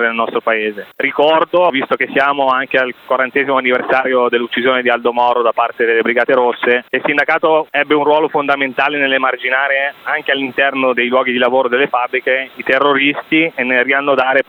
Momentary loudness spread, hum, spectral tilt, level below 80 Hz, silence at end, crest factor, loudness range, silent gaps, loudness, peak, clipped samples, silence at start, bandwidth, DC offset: 4 LU; none; -6 dB/octave; -64 dBFS; 0.05 s; 14 dB; 1 LU; none; -14 LUFS; 0 dBFS; under 0.1%; 0 s; 14.5 kHz; under 0.1%